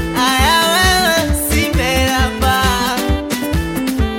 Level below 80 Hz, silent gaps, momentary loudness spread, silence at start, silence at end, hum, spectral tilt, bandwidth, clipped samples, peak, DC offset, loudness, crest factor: -22 dBFS; none; 7 LU; 0 s; 0 s; none; -3.5 dB/octave; 17 kHz; under 0.1%; 0 dBFS; under 0.1%; -14 LUFS; 14 dB